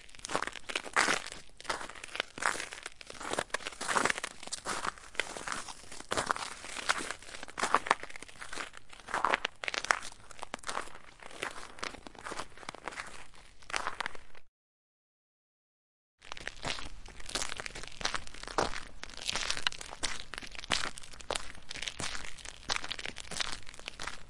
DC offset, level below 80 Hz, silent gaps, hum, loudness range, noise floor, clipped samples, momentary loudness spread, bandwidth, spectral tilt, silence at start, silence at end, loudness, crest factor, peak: under 0.1%; -54 dBFS; 14.48-16.18 s; none; 8 LU; under -90 dBFS; under 0.1%; 14 LU; 11.5 kHz; -1 dB/octave; 0 s; 0 s; -36 LUFS; 34 dB; -4 dBFS